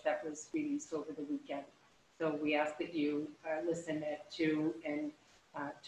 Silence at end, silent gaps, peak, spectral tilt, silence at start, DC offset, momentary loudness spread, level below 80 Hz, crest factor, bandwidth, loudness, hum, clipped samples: 0 s; none; -20 dBFS; -5 dB/octave; 0 s; under 0.1%; 11 LU; -80 dBFS; 18 dB; 10 kHz; -39 LUFS; none; under 0.1%